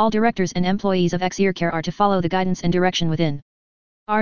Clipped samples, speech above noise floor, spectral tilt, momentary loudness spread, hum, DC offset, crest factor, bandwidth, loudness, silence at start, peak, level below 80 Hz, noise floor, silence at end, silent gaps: under 0.1%; over 70 dB; -6 dB/octave; 4 LU; none; 3%; 16 dB; 7.2 kHz; -21 LUFS; 0 s; -4 dBFS; -48 dBFS; under -90 dBFS; 0 s; 3.42-4.06 s